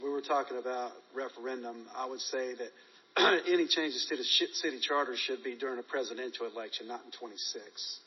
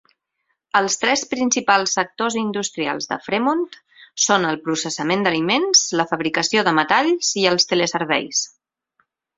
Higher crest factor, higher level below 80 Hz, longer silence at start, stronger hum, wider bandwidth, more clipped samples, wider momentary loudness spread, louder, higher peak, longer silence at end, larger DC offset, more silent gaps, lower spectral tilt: about the same, 20 dB vs 20 dB; second, under -90 dBFS vs -64 dBFS; second, 0 s vs 0.75 s; neither; second, 6.2 kHz vs 8.2 kHz; neither; first, 14 LU vs 7 LU; second, -33 LUFS vs -19 LUFS; second, -14 dBFS vs 0 dBFS; second, 0.05 s vs 0.9 s; neither; neither; second, 1.5 dB/octave vs -2 dB/octave